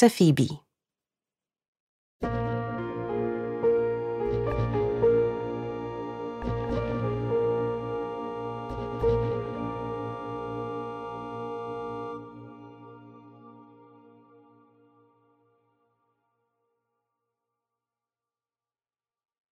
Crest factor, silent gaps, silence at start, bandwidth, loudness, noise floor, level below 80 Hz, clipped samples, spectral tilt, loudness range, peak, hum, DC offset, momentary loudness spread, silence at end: 24 dB; 1.68-1.73 s, 1.80-2.20 s; 0 s; 14 kHz; -29 LUFS; under -90 dBFS; -48 dBFS; under 0.1%; -7.5 dB/octave; 12 LU; -6 dBFS; none; under 0.1%; 15 LU; 5.7 s